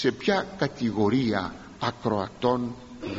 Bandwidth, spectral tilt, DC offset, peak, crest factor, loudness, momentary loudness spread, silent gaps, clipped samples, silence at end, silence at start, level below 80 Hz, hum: 7.6 kHz; -4.5 dB/octave; under 0.1%; -8 dBFS; 18 dB; -27 LUFS; 9 LU; none; under 0.1%; 0 s; 0 s; -54 dBFS; none